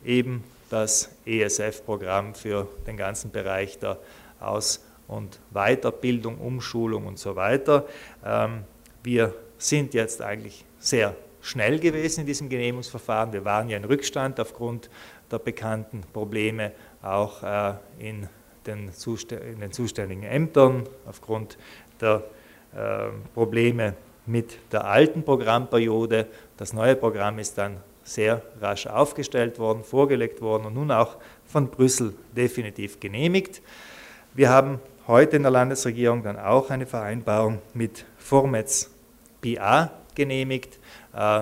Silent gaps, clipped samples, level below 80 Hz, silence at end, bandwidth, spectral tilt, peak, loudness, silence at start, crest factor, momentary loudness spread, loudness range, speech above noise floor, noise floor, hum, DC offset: none; under 0.1%; -56 dBFS; 0 s; 16 kHz; -5 dB/octave; -2 dBFS; -25 LUFS; 0 s; 22 dB; 16 LU; 8 LU; 29 dB; -53 dBFS; none; under 0.1%